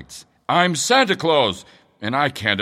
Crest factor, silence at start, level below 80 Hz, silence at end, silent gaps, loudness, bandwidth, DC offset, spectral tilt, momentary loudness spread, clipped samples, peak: 18 dB; 0 s; -60 dBFS; 0 s; none; -18 LUFS; 16 kHz; under 0.1%; -3.5 dB/octave; 17 LU; under 0.1%; -2 dBFS